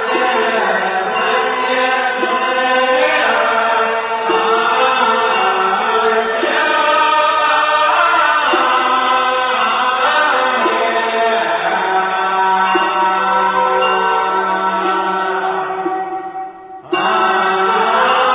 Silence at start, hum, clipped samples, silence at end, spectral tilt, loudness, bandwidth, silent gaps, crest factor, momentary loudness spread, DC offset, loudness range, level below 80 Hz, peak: 0 s; none; under 0.1%; 0 s; -6.5 dB/octave; -14 LUFS; 4 kHz; none; 12 dB; 5 LU; under 0.1%; 4 LU; -58 dBFS; -2 dBFS